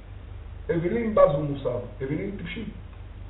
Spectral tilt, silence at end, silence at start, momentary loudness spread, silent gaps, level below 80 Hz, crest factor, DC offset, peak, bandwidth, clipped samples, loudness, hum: -7 dB/octave; 0 s; 0 s; 22 LU; none; -42 dBFS; 22 dB; under 0.1%; -4 dBFS; 4.1 kHz; under 0.1%; -26 LUFS; none